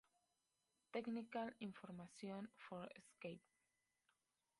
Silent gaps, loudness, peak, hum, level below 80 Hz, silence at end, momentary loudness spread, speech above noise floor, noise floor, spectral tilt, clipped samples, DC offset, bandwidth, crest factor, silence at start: none; -52 LUFS; -32 dBFS; none; -90 dBFS; 1.2 s; 9 LU; 37 dB; -89 dBFS; -6 dB/octave; under 0.1%; under 0.1%; 11 kHz; 22 dB; 0.95 s